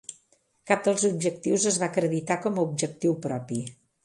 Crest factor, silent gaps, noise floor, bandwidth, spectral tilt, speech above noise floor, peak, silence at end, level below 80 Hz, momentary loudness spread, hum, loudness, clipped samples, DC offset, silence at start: 20 dB; none; -66 dBFS; 11.5 kHz; -4.5 dB/octave; 40 dB; -6 dBFS; 0.35 s; -70 dBFS; 10 LU; none; -26 LUFS; under 0.1%; under 0.1%; 0.1 s